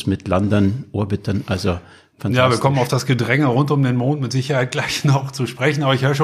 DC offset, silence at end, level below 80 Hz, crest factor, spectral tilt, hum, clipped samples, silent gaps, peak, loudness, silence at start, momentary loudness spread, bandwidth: under 0.1%; 0 s; -48 dBFS; 16 dB; -6 dB/octave; none; under 0.1%; none; -2 dBFS; -18 LUFS; 0 s; 7 LU; 14.5 kHz